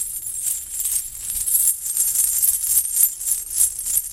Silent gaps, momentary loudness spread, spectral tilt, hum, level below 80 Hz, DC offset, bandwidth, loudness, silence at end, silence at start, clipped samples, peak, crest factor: none; 7 LU; 2.5 dB/octave; none; -50 dBFS; under 0.1%; 17 kHz; -18 LUFS; 0 s; 0 s; under 0.1%; 0 dBFS; 20 dB